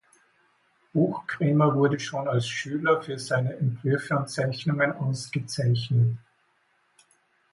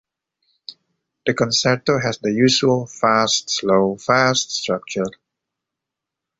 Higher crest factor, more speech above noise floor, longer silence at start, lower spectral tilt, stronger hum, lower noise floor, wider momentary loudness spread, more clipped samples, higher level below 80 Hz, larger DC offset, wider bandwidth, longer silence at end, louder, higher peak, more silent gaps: about the same, 18 dB vs 18 dB; second, 43 dB vs 66 dB; first, 0.95 s vs 0.7 s; first, -6.5 dB/octave vs -3.5 dB/octave; neither; second, -68 dBFS vs -84 dBFS; second, 7 LU vs 12 LU; neither; second, -64 dBFS vs -58 dBFS; neither; first, 11.5 kHz vs 8 kHz; about the same, 1.35 s vs 1.3 s; second, -26 LUFS vs -18 LUFS; second, -8 dBFS vs -2 dBFS; neither